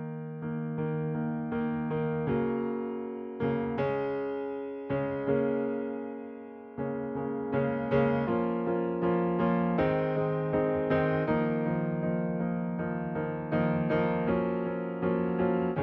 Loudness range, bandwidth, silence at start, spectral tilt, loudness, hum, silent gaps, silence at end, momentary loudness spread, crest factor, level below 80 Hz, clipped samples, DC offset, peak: 4 LU; 5.4 kHz; 0 s; -11 dB/octave; -30 LUFS; none; none; 0 s; 8 LU; 16 dB; -56 dBFS; under 0.1%; under 0.1%; -14 dBFS